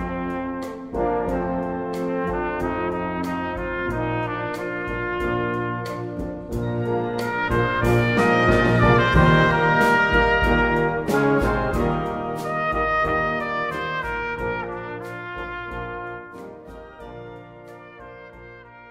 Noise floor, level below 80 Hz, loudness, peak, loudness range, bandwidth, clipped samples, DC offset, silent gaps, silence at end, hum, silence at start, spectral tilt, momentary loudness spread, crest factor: -43 dBFS; -36 dBFS; -22 LUFS; -2 dBFS; 14 LU; 16 kHz; under 0.1%; under 0.1%; none; 0 s; none; 0 s; -7 dB/octave; 22 LU; 20 dB